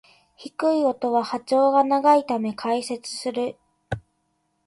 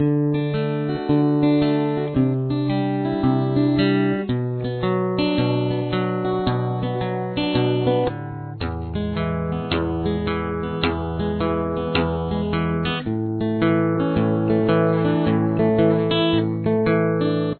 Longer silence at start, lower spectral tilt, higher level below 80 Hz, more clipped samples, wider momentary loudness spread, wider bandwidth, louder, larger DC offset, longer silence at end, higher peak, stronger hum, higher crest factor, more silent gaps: first, 0.4 s vs 0 s; second, -5 dB/octave vs -11 dB/octave; second, -58 dBFS vs -42 dBFS; neither; first, 16 LU vs 6 LU; first, 11.5 kHz vs 4.5 kHz; about the same, -22 LUFS vs -21 LUFS; neither; first, 0.65 s vs 0 s; about the same, -6 dBFS vs -4 dBFS; neither; about the same, 18 dB vs 16 dB; neither